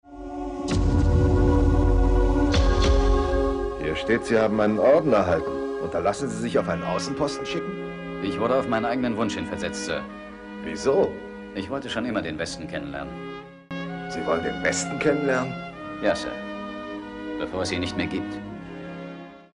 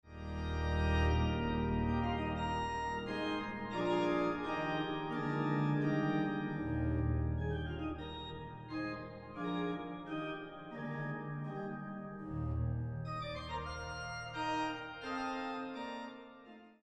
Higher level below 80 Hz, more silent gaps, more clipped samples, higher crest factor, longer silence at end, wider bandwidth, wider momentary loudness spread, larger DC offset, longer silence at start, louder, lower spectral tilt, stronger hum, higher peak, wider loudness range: first, -30 dBFS vs -46 dBFS; neither; neither; about the same, 16 dB vs 16 dB; about the same, 0.1 s vs 0.15 s; first, 10.5 kHz vs 9 kHz; first, 15 LU vs 11 LU; neither; about the same, 0.05 s vs 0.05 s; first, -25 LUFS vs -38 LUFS; second, -6 dB/octave vs -7.5 dB/octave; neither; first, -8 dBFS vs -22 dBFS; about the same, 8 LU vs 6 LU